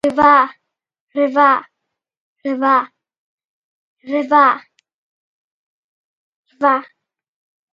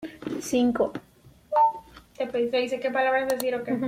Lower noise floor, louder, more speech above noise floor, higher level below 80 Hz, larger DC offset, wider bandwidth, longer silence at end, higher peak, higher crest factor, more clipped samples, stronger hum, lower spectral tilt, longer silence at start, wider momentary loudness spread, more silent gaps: first, -78 dBFS vs -46 dBFS; first, -15 LUFS vs -26 LUFS; first, 64 dB vs 21 dB; about the same, -60 dBFS vs -60 dBFS; neither; second, 10.5 kHz vs 16.5 kHz; first, 0.9 s vs 0 s; first, 0 dBFS vs -10 dBFS; about the same, 18 dB vs 16 dB; neither; neither; first, -5.5 dB/octave vs -4 dB/octave; about the same, 0.05 s vs 0 s; first, 14 LU vs 11 LU; first, 1.00-1.07 s, 2.17-2.36 s, 3.18-3.38 s, 3.45-3.97 s, 4.94-6.43 s vs none